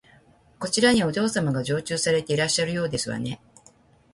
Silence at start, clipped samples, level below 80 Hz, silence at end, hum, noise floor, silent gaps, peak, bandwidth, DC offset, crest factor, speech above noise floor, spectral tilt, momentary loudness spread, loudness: 0.6 s; under 0.1%; -56 dBFS; 0.8 s; none; -56 dBFS; none; -4 dBFS; 11.5 kHz; under 0.1%; 20 dB; 33 dB; -4 dB/octave; 12 LU; -24 LUFS